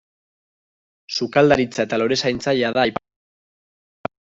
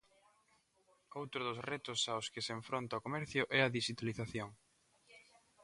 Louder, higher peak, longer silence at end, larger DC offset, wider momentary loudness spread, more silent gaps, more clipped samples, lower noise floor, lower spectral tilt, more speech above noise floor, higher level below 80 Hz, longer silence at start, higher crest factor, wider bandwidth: first, -19 LUFS vs -39 LUFS; first, -4 dBFS vs -16 dBFS; first, 1.35 s vs 0.45 s; neither; first, 16 LU vs 12 LU; neither; neither; first, under -90 dBFS vs -75 dBFS; about the same, -5 dB/octave vs -4 dB/octave; first, over 71 dB vs 35 dB; first, -54 dBFS vs -74 dBFS; about the same, 1.1 s vs 1.1 s; second, 18 dB vs 26 dB; second, 8 kHz vs 11.5 kHz